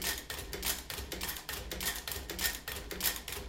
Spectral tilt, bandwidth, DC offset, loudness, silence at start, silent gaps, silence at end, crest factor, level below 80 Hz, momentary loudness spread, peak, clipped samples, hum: -1.5 dB/octave; 17 kHz; under 0.1%; -36 LUFS; 0 s; none; 0 s; 24 dB; -48 dBFS; 7 LU; -14 dBFS; under 0.1%; none